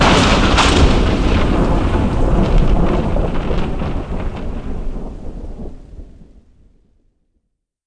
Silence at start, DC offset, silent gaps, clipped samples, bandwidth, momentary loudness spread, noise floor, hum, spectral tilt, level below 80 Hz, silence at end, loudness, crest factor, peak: 0 s; under 0.1%; none; under 0.1%; 10.5 kHz; 20 LU; -69 dBFS; none; -5.5 dB/octave; -18 dBFS; 1.65 s; -16 LUFS; 14 dB; 0 dBFS